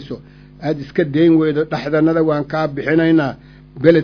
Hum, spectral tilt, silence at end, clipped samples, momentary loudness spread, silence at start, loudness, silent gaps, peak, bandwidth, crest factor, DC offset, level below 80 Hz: none; -9 dB/octave; 0 s; under 0.1%; 11 LU; 0 s; -16 LUFS; none; 0 dBFS; 5.4 kHz; 16 dB; under 0.1%; -48 dBFS